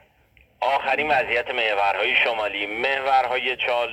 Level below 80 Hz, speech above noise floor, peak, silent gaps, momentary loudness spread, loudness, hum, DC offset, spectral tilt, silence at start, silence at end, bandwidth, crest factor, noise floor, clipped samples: -58 dBFS; 36 dB; -6 dBFS; none; 5 LU; -21 LUFS; none; under 0.1%; -3 dB/octave; 0.6 s; 0 s; 14.5 kHz; 16 dB; -58 dBFS; under 0.1%